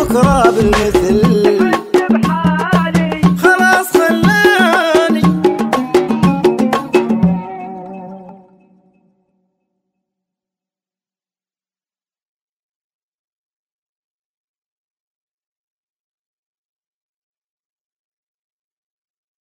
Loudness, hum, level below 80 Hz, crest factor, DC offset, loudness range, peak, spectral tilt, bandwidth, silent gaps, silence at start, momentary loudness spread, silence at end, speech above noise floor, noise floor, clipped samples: -12 LUFS; none; -36 dBFS; 16 dB; under 0.1%; 9 LU; 0 dBFS; -6 dB/octave; 16 kHz; none; 0 s; 7 LU; 11.1 s; over 80 dB; under -90 dBFS; under 0.1%